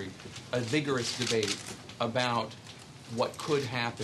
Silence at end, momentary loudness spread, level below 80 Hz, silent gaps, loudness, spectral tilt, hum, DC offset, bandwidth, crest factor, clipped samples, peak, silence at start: 0 s; 14 LU; -66 dBFS; none; -31 LUFS; -4 dB/octave; none; under 0.1%; 12.5 kHz; 20 dB; under 0.1%; -14 dBFS; 0 s